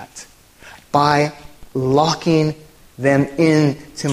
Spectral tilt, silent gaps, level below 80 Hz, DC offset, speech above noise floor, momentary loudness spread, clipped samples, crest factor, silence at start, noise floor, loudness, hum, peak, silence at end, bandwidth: -6 dB/octave; none; -48 dBFS; under 0.1%; 28 dB; 13 LU; under 0.1%; 18 dB; 0 s; -44 dBFS; -17 LUFS; none; 0 dBFS; 0 s; 15 kHz